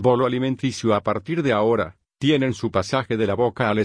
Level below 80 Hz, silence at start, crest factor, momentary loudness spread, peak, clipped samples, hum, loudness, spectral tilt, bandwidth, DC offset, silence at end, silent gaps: -54 dBFS; 0 s; 16 dB; 5 LU; -4 dBFS; under 0.1%; none; -22 LUFS; -6 dB/octave; 10.5 kHz; under 0.1%; 0 s; none